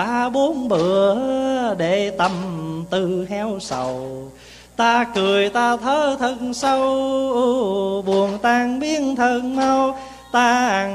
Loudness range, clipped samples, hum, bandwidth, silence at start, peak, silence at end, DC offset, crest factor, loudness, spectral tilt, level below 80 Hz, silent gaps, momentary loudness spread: 4 LU; under 0.1%; 60 Hz at -50 dBFS; 13.5 kHz; 0 s; -4 dBFS; 0 s; under 0.1%; 16 dB; -19 LUFS; -4.5 dB/octave; -52 dBFS; none; 8 LU